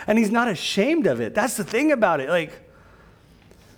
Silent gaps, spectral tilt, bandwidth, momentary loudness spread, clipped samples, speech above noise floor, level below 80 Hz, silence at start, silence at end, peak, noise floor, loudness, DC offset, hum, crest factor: none; -4.5 dB/octave; over 20 kHz; 5 LU; under 0.1%; 30 dB; -58 dBFS; 0 s; 1.2 s; -6 dBFS; -51 dBFS; -21 LUFS; under 0.1%; none; 18 dB